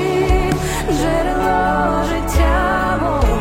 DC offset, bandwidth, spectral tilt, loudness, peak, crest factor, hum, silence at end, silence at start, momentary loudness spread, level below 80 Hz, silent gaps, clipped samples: under 0.1%; 16.5 kHz; -5.5 dB/octave; -17 LUFS; -2 dBFS; 14 dB; none; 0 s; 0 s; 3 LU; -22 dBFS; none; under 0.1%